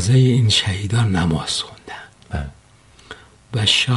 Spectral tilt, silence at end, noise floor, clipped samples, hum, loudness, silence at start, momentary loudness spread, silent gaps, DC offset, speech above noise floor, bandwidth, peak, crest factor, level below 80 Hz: -4.5 dB/octave; 0 s; -49 dBFS; under 0.1%; none; -18 LUFS; 0 s; 22 LU; none; under 0.1%; 32 dB; 11.5 kHz; -2 dBFS; 18 dB; -40 dBFS